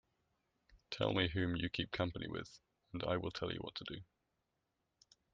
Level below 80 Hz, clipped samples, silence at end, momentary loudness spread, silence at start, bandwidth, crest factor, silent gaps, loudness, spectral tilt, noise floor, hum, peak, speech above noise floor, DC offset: -64 dBFS; under 0.1%; 1.3 s; 14 LU; 0.7 s; 7.6 kHz; 22 dB; none; -40 LUFS; -6.5 dB/octave; -86 dBFS; none; -20 dBFS; 46 dB; under 0.1%